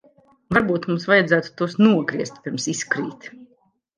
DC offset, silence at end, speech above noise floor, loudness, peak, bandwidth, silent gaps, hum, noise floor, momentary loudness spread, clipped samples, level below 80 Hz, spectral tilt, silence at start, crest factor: under 0.1%; 0.55 s; 42 dB; -20 LUFS; -2 dBFS; 10 kHz; none; none; -62 dBFS; 12 LU; under 0.1%; -56 dBFS; -5 dB/octave; 0.5 s; 20 dB